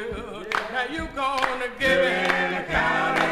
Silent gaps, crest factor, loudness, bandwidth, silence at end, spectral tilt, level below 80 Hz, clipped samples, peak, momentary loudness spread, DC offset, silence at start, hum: none; 20 dB; -23 LUFS; 15.5 kHz; 0 s; -4 dB/octave; -44 dBFS; under 0.1%; -4 dBFS; 8 LU; under 0.1%; 0 s; none